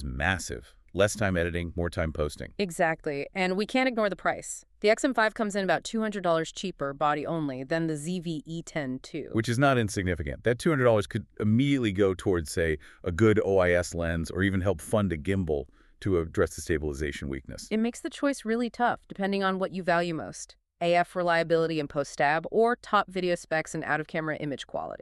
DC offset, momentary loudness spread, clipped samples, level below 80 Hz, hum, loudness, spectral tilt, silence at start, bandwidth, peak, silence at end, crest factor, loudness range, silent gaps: under 0.1%; 10 LU; under 0.1%; -48 dBFS; none; -28 LUFS; -5.5 dB/octave; 0 s; 13.5 kHz; -8 dBFS; 0.05 s; 18 dB; 4 LU; none